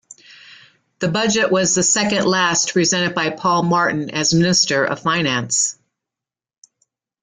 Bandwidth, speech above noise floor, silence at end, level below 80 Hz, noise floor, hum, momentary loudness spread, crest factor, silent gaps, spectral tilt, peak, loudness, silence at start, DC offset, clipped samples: 10 kHz; 71 dB; 1.5 s; -56 dBFS; -88 dBFS; none; 5 LU; 16 dB; none; -3 dB/octave; -4 dBFS; -17 LUFS; 0.1 s; under 0.1%; under 0.1%